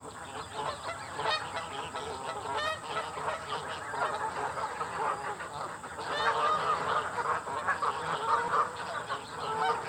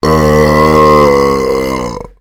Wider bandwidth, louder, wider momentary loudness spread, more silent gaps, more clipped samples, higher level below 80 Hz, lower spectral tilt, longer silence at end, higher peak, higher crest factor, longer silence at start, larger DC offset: about the same, 17.5 kHz vs 17 kHz; second, -33 LUFS vs -8 LUFS; about the same, 10 LU vs 11 LU; neither; second, under 0.1% vs 1%; second, -64 dBFS vs -24 dBFS; second, -3 dB/octave vs -6 dB/octave; second, 0 s vs 0.15 s; second, -14 dBFS vs 0 dBFS; first, 18 dB vs 8 dB; about the same, 0 s vs 0.05 s; neither